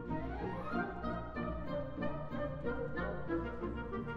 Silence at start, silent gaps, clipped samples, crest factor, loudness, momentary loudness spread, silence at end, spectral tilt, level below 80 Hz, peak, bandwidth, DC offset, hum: 0 s; none; under 0.1%; 14 dB; -40 LUFS; 3 LU; 0 s; -9 dB/octave; -50 dBFS; -24 dBFS; 6.6 kHz; under 0.1%; none